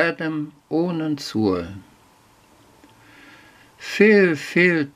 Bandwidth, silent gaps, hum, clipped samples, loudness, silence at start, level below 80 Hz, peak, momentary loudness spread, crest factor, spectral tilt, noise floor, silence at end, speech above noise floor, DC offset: 15.5 kHz; none; none; under 0.1%; -20 LUFS; 0 s; -60 dBFS; -2 dBFS; 17 LU; 20 dB; -6 dB/octave; -54 dBFS; 0.05 s; 34 dB; under 0.1%